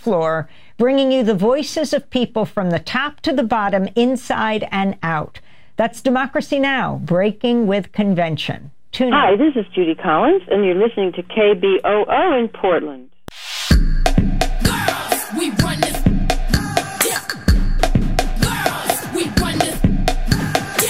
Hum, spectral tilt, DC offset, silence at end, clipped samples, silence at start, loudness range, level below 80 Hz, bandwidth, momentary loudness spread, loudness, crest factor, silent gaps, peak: none; -5 dB/octave; 0.9%; 0 s; under 0.1%; 0.05 s; 3 LU; -24 dBFS; 16 kHz; 6 LU; -18 LUFS; 16 dB; none; -2 dBFS